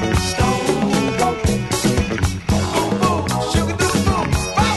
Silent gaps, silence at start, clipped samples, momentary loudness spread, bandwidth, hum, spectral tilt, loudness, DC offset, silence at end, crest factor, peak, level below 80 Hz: none; 0 s; under 0.1%; 2 LU; 12.5 kHz; none; -5 dB/octave; -18 LUFS; under 0.1%; 0 s; 14 dB; -4 dBFS; -30 dBFS